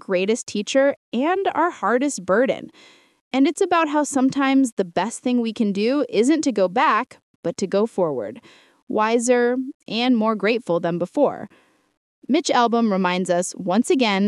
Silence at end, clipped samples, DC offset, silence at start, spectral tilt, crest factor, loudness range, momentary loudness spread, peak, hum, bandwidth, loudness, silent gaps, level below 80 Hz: 0 s; under 0.1%; under 0.1%; 0.1 s; -4.5 dB/octave; 16 dB; 2 LU; 9 LU; -4 dBFS; none; 12 kHz; -21 LUFS; 0.97-1.12 s, 3.21-3.31 s, 4.72-4.77 s, 7.23-7.43 s, 8.82-8.87 s, 9.74-9.80 s, 11.97-12.22 s; -72 dBFS